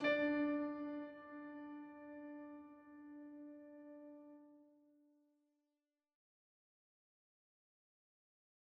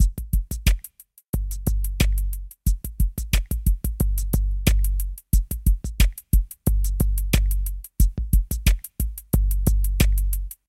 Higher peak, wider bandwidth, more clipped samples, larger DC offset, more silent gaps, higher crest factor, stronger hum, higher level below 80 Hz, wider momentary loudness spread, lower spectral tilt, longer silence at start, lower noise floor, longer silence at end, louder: second, -24 dBFS vs -4 dBFS; second, 5.8 kHz vs 16.5 kHz; neither; neither; second, none vs 1.28-1.33 s; first, 24 dB vs 18 dB; neither; second, -86 dBFS vs -22 dBFS; first, 21 LU vs 7 LU; second, -2.5 dB/octave vs -5 dB/octave; about the same, 0 s vs 0 s; first, under -90 dBFS vs -46 dBFS; first, 4 s vs 0.15 s; second, -45 LUFS vs -25 LUFS